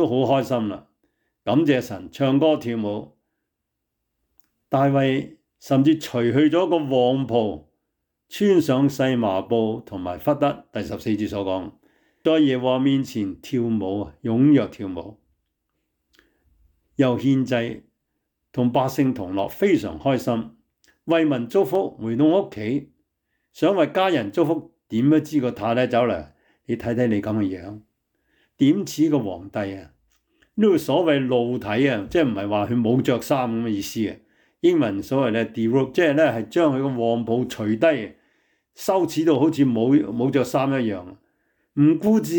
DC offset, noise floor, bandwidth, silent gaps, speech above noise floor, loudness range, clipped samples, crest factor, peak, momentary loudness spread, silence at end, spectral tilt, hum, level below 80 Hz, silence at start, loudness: under 0.1%; -80 dBFS; 19.5 kHz; none; 59 dB; 4 LU; under 0.1%; 14 dB; -8 dBFS; 11 LU; 0 s; -7 dB/octave; none; -60 dBFS; 0 s; -22 LUFS